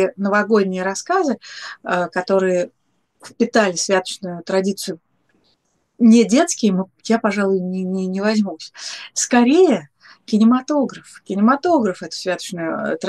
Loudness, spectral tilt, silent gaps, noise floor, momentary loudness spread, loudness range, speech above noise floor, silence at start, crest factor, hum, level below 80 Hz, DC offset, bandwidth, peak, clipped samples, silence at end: -18 LUFS; -4.5 dB/octave; none; -65 dBFS; 14 LU; 3 LU; 48 dB; 0 s; 18 dB; none; -70 dBFS; under 0.1%; 12.5 kHz; 0 dBFS; under 0.1%; 0 s